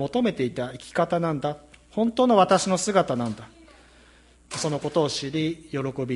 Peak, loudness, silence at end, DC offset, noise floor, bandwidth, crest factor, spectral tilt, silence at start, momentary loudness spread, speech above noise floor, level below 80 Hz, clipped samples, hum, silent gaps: -4 dBFS; -24 LUFS; 0 s; under 0.1%; -54 dBFS; 11.5 kHz; 20 dB; -5 dB/octave; 0 s; 13 LU; 30 dB; -58 dBFS; under 0.1%; none; none